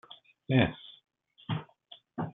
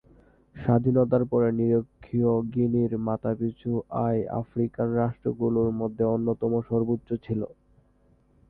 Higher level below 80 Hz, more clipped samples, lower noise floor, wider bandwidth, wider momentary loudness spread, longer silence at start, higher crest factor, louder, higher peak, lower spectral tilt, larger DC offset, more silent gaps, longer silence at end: second, -62 dBFS vs -54 dBFS; neither; second, -57 dBFS vs -62 dBFS; about the same, 3.9 kHz vs 3.7 kHz; first, 25 LU vs 8 LU; second, 0.1 s vs 0.55 s; first, 24 dB vs 16 dB; second, -31 LUFS vs -26 LUFS; about the same, -10 dBFS vs -10 dBFS; second, -5.5 dB/octave vs -13 dB/octave; neither; neither; second, 0.05 s vs 1 s